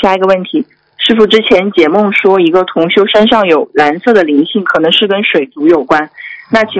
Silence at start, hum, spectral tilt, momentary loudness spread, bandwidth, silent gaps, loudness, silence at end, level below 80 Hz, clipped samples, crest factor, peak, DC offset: 0 s; none; -5.5 dB/octave; 6 LU; 8 kHz; none; -9 LUFS; 0 s; -48 dBFS; 3%; 10 dB; 0 dBFS; under 0.1%